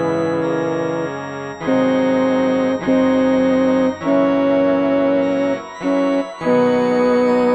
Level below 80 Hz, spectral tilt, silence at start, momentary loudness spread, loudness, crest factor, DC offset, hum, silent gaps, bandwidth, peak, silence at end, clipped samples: -52 dBFS; -7 dB/octave; 0 s; 6 LU; -17 LUFS; 12 dB; under 0.1%; none; none; 8 kHz; -4 dBFS; 0 s; under 0.1%